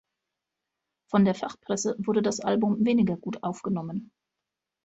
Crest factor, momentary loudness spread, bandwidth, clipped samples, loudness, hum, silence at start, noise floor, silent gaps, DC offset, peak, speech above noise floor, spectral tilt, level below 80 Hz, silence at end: 18 dB; 9 LU; 8.2 kHz; under 0.1%; -27 LUFS; none; 1.1 s; -86 dBFS; none; under 0.1%; -10 dBFS; 61 dB; -6 dB/octave; -66 dBFS; 0.8 s